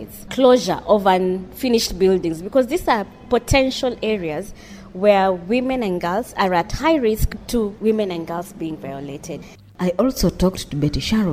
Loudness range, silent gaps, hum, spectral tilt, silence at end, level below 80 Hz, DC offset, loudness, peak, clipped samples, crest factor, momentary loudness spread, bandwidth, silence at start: 5 LU; none; none; -5.5 dB/octave; 0 s; -34 dBFS; under 0.1%; -19 LUFS; -2 dBFS; under 0.1%; 18 dB; 14 LU; 16.5 kHz; 0 s